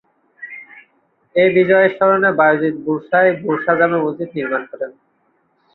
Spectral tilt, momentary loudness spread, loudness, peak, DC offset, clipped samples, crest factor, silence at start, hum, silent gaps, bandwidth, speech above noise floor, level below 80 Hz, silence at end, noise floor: -10 dB/octave; 19 LU; -15 LUFS; -2 dBFS; under 0.1%; under 0.1%; 16 dB; 0.4 s; none; none; 4.2 kHz; 47 dB; -64 dBFS; 0.85 s; -62 dBFS